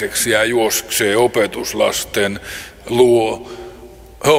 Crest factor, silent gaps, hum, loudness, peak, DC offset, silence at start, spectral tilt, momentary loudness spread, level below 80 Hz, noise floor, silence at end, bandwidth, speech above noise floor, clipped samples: 16 dB; none; none; -16 LUFS; 0 dBFS; under 0.1%; 0 s; -3 dB/octave; 17 LU; -44 dBFS; -38 dBFS; 0 s; 16.5 kHz; 22 dB; under 0.1%